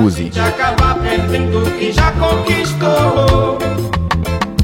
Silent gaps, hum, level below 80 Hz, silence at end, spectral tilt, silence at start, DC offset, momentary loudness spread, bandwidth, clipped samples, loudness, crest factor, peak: none; none; -22 dBFS; 0 s; -6 dB/octave; 0 s; under 0.1%; 5 LU; 16.5 kHz; under 0.1%; -14 LUFS; 14 dB; 0 dBFS